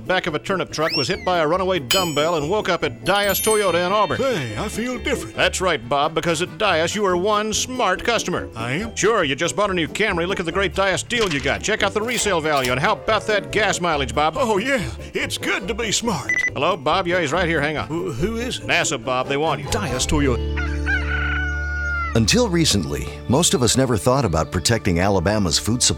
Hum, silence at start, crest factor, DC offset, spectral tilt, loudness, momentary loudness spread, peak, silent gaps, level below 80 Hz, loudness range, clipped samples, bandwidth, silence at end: none; 0 s; 18 dB; under 0.1%; -3.5 dB/octave; -20 LUFS; 6 LU; -2 dBFS; none; -34 dBFS; 2 LU; under 0.1%; 17.5 kHz; 0 s